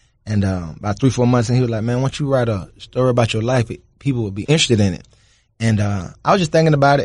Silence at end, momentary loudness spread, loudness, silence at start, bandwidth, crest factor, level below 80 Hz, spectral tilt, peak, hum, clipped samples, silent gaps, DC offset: 0 s; 10 LU; -18 LUFS; 0.25 s; 11 kHz; 14 dB; -44 dBFS; -6 dB/octave; -2 dBFS; none; under 0.1%; none; under 0.1%